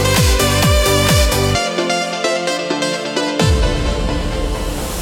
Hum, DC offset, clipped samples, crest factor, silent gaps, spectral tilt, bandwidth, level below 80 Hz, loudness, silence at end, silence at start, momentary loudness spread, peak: none; under 0.1%; under 0.1%; 14 dB; none; -4 dB/octave; 17.5 kHz; -22 dBFS; -16 LUFS; 0 s; 0 s; 8 LU; 0 dBFS